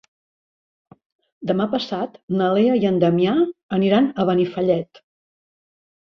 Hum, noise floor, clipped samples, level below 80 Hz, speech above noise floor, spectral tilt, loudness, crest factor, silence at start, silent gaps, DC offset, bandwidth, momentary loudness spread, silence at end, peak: none; under -90 dBFS; under 0.1%; -62 dBFS; over 71 dB; -8.5 dB/octave; -20 LUFS; 18 dB; 1.4 s; 2.23-2.28 s, 3.63-3.69 s; under 0.1%; 6.4 kHz; 8 LU; 1.2 s; -4 dBFS